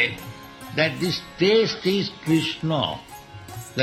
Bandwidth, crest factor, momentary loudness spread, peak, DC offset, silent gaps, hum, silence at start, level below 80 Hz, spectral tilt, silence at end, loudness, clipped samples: 16 kHz; 18 dB; 20 LU; -6 dBFS; under 0.1%; none; none; 0 s; -56 dBFS; -5 dB/octave; 0 s; -23 LUFS; under 0.1%